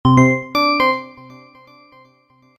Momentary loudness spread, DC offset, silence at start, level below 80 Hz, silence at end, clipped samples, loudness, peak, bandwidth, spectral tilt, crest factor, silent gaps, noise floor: 12 LU; under 0.1%; 0.05 s; -44 dBFS; 1.5 s; under 0.1%; -15 LUFS; 0 dBFS; 15 kHz; -6.5 dB/octave; 18 dB; none; -55 dBFS